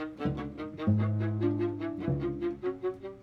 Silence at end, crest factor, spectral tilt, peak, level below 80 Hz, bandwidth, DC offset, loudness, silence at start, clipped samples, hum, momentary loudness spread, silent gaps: 0 s; 16 dB; -10 dB/octave; -16 dBFS; -52 dBFS; 5 kHz; under 0.1%; -32 LUFS; 0 s; under 0.1%; none; 8 LU; none